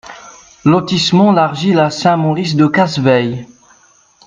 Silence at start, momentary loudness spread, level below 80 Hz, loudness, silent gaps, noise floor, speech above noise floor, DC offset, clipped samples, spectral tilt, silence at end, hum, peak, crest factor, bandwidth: 0.05 s; 7 LU; -52 dBFS; -12 LUFS; none; -49 dBFS; 37 dB; under 0.1%; under 0.1%; -6 dB/octave; 0.8 s; none; 0 dBFS; 14 dB; 9.4 kHz